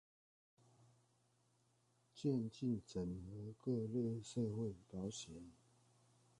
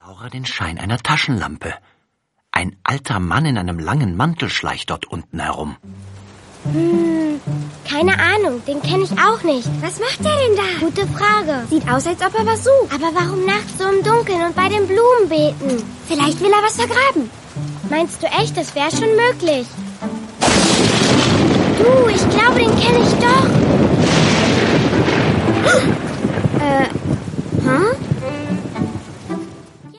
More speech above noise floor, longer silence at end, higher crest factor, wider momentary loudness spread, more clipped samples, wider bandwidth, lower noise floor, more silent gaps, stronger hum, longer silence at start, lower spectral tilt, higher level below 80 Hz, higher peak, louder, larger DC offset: second, 35 dB vs 52 dB; first, 0.85 s vs 0.1 s; about the same, 18 dB vs 16 dB; about the same, 11 LU vs 12 LU; neither; about the same, 11 kHz vs 11.5 kHz; first, -78 dBFS vs -68 dBFS; neither; neither; first, 2.15 s vs 0.1 s; first, -7 dB/octave vs -5 dB/octave; second, -70 dBFS vs -42 dBFS; second, -28 dBFS vs 0 dBFS; second, -44 LUFS vs -16 LUFS; neither